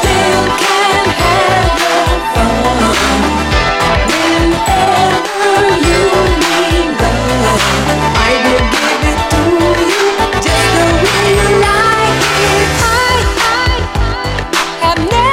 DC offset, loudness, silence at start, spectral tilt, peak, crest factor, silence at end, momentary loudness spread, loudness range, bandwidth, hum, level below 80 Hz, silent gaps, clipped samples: under 0.1%; -10 LUFS; 0 s; -4 dB/octave; 0 dBFS; 10 dB; 0 s; 3 LU; 1 LU; 17 kHz; none; -22 dBFS; none; under 0.1%